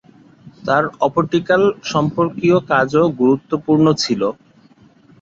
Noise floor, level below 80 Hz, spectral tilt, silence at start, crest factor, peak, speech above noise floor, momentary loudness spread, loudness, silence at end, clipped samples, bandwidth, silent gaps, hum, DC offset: -49 dBFS; -54 dBFS; -6 dB/octave; 0.45 s; 16 dB; -2 dBFS; 34 dB; 5 LU; -16 LUFS; 0.9 s; under 0.1%; 7.8 kHz; none; none; under 0.1%